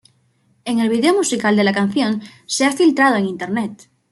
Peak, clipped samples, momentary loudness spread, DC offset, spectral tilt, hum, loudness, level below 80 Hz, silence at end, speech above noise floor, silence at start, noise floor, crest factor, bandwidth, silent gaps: -2 dBFS; under 0.1%; 10 LU; under 0.1%; -4 dB/octave; none; -17 LUFS; -64 dBFS; 0.35 s; 43 dB; 0.65 s; -60 dBFS; 16 dB; 12.5 kHz; none